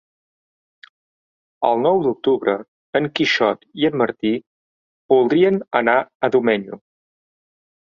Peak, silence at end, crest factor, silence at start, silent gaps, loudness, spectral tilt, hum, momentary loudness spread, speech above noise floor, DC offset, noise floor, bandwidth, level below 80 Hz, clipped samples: -2 dBFS; 1.2 s; 18 dB; 1.6 s; 2.68-2.93 s, 4.47-5.09 s, 6.15-6.20 s; -19 LUFS; -6 dB/octave; none; 7 LU; over 72 dB; under 0.1%; under -90 dBFS; 7.2 kHz; -64 dBFS; under 0.1%